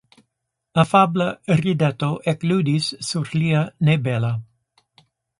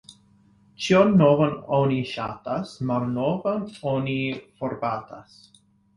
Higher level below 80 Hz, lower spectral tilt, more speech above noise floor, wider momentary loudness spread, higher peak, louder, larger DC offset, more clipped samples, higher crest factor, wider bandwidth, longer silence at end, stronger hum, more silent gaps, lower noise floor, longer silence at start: about the same, -56 dBFS vs -58 dBFS; about the same, -6.5 dB/octave vs -7 dB/octave; first, 58 dB vs 35 dB; second, 8 LU vs 14 LU; about the same, -2 dBFS vs -4 dBFS; first, -20 LUFS vs -24 LUFS; neither; neither; about the same, 20 dB vs 20 dB; about the same, 11.5 kHz vs 11.5 kHz; first, 0.95 s vs 0.75 s; neither; neither; first, -78 dBFS vs -58 dBFS; first, 0.75 s vs 0.1 s